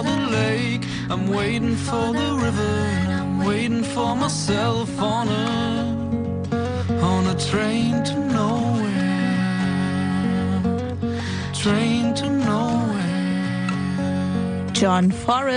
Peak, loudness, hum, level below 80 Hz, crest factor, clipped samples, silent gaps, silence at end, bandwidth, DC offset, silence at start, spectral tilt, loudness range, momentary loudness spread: -4 dBFS; -22 LUFS; none; -48 dBFS; 16 dB; under 0.1%; none; 0 s; 10 kHz; under 0.1%; 0 s; -6 dB/octave; 1 LU; 4 LU